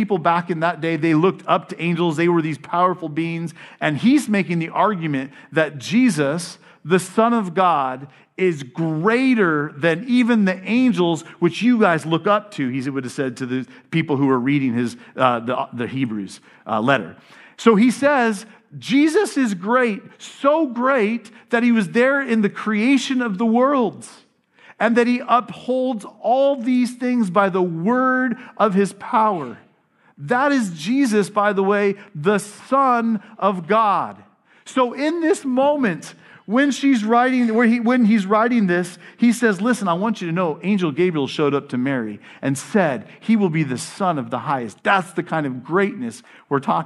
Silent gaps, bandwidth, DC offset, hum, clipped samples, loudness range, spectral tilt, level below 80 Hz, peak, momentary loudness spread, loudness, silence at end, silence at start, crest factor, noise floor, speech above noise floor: none; 12 kHz; under 0.1%; none; under 0.1%; 3 LU; -6 dB/octave; -74 dBFS; 0 dBFS; 9 LU; -19 LUFS; 0 s; 0 s; 18 dB; -58 dBFS; 39 dB